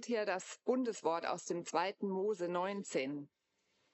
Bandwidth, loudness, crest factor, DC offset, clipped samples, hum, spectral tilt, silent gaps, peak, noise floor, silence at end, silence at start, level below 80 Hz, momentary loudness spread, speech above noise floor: 8.2 kHz; -38 LUFS; 18 dB; under 0.1%; under 0.1%; none; -4.5 dB/octave; none; -20 dBFS; -80 dBFS; 0.7 s; 0 s; under -90 dBFS; 4 LU; 42 dB